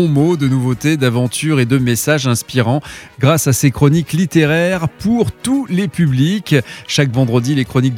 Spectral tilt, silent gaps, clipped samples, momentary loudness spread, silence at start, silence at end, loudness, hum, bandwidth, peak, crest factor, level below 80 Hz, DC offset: -5.5 dB/octave; none; under 0.1%; 4 LU; 0 s; 0 s; -15 LUFS; none; 17 kHz; 0 dBFS; 14 dB; -44 dBFS; under 0.1%